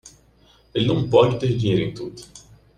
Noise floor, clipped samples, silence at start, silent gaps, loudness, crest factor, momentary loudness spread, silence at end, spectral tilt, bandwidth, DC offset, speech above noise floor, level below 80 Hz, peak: -55 dBFS; under 0.1%; 0.05 s; none; -20 LUFS; 20 dB; 18 LU; 0.4 s; -7 dB/octave; 10.5 kHz; under 0.1%; 35 dB; -48 dBFS; -2 dBFS